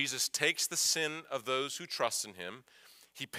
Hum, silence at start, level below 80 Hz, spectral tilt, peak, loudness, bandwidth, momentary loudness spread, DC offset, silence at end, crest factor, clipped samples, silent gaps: none; 0 s; -86 dBFS; -0.5 dB/octave; -14 dBFS; -32 LUFS; 16 kHz; 16 LU; under 0.1%; 0 s; 22 dB; under 0.1%; none